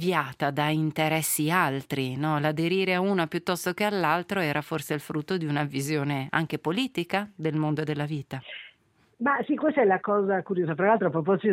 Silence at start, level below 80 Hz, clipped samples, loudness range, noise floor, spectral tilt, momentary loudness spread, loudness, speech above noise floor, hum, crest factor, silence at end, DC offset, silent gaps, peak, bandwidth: 0 s; -70 dBFS; under 0.1%; 3 LU; -64 dBFS; -5 dB/octave; 7 LU; -26 LUFS; 38 dB; none; 20 dB; 0 s; under 0.1%; none; -6 dBFS; 16 kHz